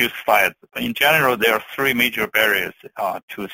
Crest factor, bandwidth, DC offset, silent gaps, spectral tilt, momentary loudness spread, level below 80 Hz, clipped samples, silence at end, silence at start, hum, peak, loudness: 18 dB; 17 kHz; under 0.1%; 3.23-3.28 s; -3 dB/octave; 11 LU; -56 dBFS; under 0.1%; 0 s; 0 s; none; -2 dBFS; -18 LUFS